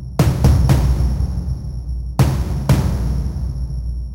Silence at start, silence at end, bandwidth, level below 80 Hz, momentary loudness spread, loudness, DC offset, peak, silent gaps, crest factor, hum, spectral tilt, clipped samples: 0 s; 0 s; 16 kHz; -20 dBFS; 11 LU; -19 LUFS; under 0.1%; -4 dBFS; none; 12 dB; none; -7 dB/octave; under 0.1%